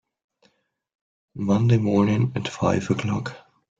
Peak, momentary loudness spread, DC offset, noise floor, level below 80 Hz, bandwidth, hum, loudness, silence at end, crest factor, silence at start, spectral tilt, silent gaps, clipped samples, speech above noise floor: -6 dBFS; 11 LU; under 0.1%; -66 dBFS; -56 dBFS; 7.8 kHz; none; -22 LUFS; 0.4 s; 18 dB; 1.35 s; -7.5 dB/octave; none; under 0.1%; 45 dB